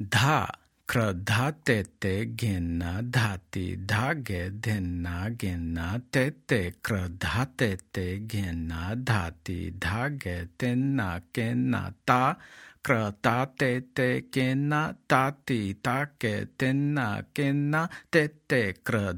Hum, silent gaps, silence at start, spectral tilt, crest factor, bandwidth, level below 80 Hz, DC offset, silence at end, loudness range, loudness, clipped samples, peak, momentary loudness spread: none; none; 0 s; -6 dB/octave; 22 dB; 17.5 kHz; -54 dBFS; under 0.1%; 0 s; 3 LU; -28 LUFS; under 0.1%; -6 dBFS; 7 LU